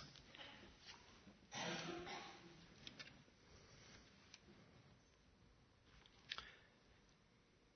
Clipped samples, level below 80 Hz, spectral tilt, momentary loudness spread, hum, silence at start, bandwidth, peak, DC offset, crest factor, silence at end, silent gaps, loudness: under 0.1%; -76 dBFS; -2 dB/octave; 19 LU; none; 0 s; 6.4 kHz; -26 dBFS; under 0.1%; 32 dB; 0 s; none; -55 LUFS